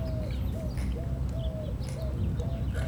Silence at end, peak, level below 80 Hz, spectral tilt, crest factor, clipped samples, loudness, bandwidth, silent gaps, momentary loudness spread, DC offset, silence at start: 0 s; -20 dBFS; -34 dBFS; -7.5 dB/octave; 12 dB; under 0.1%; -33 LUFS; 16.5 kHz; none; 3 LU; under 0.1%; 0 s